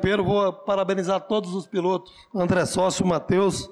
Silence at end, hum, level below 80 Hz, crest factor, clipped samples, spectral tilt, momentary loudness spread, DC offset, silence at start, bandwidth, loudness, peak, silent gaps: 0 s; none; -50 dBFS; 12 dB; under 0.1%; -5.5 dB/octave; 6 LU; under 0.1%; 0 s; 13 kHz; -24 LUFS; -12 dBFS; none